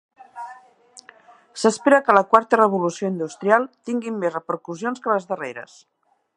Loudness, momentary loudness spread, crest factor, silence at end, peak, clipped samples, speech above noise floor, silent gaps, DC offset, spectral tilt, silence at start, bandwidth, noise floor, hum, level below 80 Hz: -20 LUFS; 22 LU; 22 dB; 0.7 s; 0 dBFS; under 0.1%; 30 dB; none; under 0.1%; -5 dB/octave; 0.35 s; 11 kHz; -50 dBFS; none; -68 dBFS